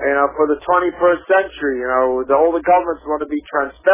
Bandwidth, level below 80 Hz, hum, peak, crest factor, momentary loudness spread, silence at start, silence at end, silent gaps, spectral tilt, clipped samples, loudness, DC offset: 3.7 kHz; -48 dBFS; none; -2 dBFS; 14 dB; 7 LU; 0 s; 0 s; none; -8.5 dB/octave; under 0.1%; -17 LUFS; under 0.1%